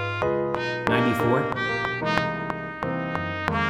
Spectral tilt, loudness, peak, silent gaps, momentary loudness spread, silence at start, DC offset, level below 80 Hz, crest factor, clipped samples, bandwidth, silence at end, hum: -6.5 dB/octave; -25 LUFS; -2 dBFS; none; 7 LU; 0 s; under 0.1%; -52 dBFS; 24 dB; under 0.1%; 18.5 kHz; 0 s; none